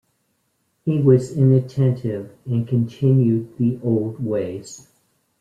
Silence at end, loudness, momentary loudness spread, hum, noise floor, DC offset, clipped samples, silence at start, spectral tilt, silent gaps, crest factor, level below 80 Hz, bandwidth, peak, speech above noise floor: 0.6 s; -20 LUFS; 13 LU; none; -69 dBFS; under 0.1%; under 0.1%; 0.85 s; -9.5 dB/octave; none; 16 dB; -58 dBFS; 9 kHz; -4 dBFS; 50 dB